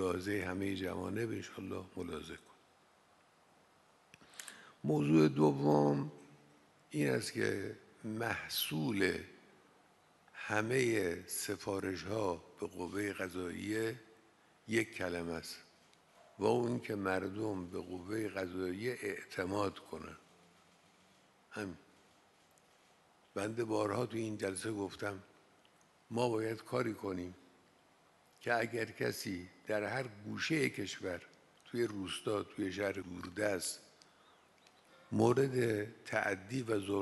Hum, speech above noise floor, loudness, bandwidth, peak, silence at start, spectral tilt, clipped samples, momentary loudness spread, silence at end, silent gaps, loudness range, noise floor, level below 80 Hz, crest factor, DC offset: none; 31 dB; -37 LUFS; 12 kHz; -16 dBFS; 0 s; -5 dB/octave; under 0.1%; 14 LU; 0 s; none; 9 LU; -68 dBFS; -72 dBFS; 22 dB; under 0.1%